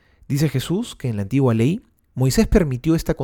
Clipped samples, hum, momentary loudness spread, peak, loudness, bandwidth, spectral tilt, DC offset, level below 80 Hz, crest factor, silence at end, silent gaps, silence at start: under 0.1%; none; 9 LU; -2 dBFS; -20 LUFS; 18.5 kHz; -6.5 dB/octave; under 0.1%; -32 dBFS; 18 dB; 0 s; none; 0.3 s